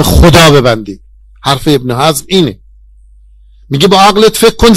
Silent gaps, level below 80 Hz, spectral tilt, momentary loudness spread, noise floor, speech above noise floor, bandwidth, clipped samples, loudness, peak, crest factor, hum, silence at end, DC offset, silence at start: none; -20 dBFS; -5 dB/octave; 13 LU; -39 dBFS; 32 dB; 17.5 kHz; 3%; -7 LUFS; 0 dBFS; 8 dB; none; 0 s; under 0.1%; 0 s